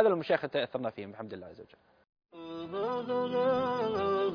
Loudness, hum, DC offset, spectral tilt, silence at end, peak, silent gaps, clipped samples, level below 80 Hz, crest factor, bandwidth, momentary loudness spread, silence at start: -32 LUFS; none; under 0.1%; -4 dB/octave; 0 s; -10 dBFS; 2.09-2.13 s; under 0.1%; -70 dBFS; 22 dB; 5.2 kHz; 15 LU; 0 s